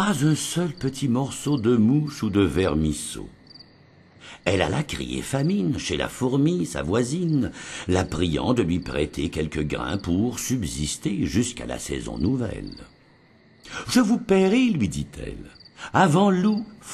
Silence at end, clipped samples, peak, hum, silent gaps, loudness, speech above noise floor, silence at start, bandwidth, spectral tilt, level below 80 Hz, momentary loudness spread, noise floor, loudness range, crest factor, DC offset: 0 s; under 0.1%; -4 dBFS; none; none; -24 LUFS; 32 dB; 0 s; 13 kHz; -5.5 dB/octave; -42 dBFS; 12 LU; -55 dBFS; 4 LU; 20 dB; under 0.1%